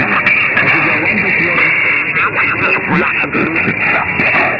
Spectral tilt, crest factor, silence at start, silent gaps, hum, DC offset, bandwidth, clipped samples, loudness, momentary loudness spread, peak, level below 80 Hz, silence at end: -7 dB/octave; 12 dB; 0 s; none; none; under 0.1%; 7 kHz; under 0.1%; -11 LUFS; 3 LU; 0 dBFS; -44 dBFS; 0 s